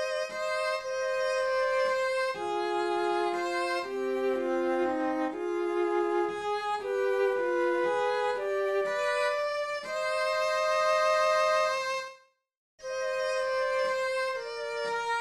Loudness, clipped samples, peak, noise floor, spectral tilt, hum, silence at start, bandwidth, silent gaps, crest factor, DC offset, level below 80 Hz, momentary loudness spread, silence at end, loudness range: -29 LUFS; under 0.1%; -16 dBFS; -55 dBFS; -2.5 dB/octave; none; 0 s; 13.5 kHz; 12.57-12.78 s; 14 dB; under 0.1%; -70 dBFS; 6 LU; 0 s; 2 LU